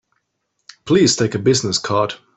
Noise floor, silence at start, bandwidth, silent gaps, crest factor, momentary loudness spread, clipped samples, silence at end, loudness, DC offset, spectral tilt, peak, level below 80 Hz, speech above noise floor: -72 dBFS; 0.85 s; 8.4 kHz; none; 16 dB; 6 LU; under 0.1%; 0.2 s; -16 LUFS; under 0.1%; -4 dB/octave; -2 dBFS; -54 dBFS; 55 dB